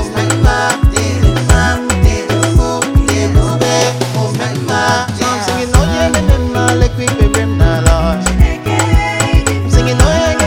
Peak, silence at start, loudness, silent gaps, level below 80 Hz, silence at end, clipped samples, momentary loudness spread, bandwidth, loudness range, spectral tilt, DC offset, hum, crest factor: 0 dBFS; 0 s; -12 LUFS; none; -16 dBFS; 0 s; 0.3%; 4 LU; 17 kHz; 1 LU; -5 dB/octave; under 0.1%; none; 12 dB